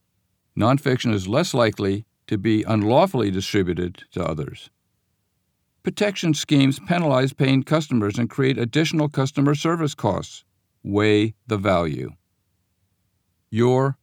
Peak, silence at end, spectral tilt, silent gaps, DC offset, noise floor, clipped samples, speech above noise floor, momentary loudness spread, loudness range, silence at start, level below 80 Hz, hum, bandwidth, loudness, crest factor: -4 dBFS; 0.1 s; -6 dB/octave; none; under 0.1%; -72 dBFS; under 0.1%; 51 dB; 11 LU; 4 LU; 0.55 s; -54 dBFS; none; 16.5 kHz; -21 LUFS; 18 dB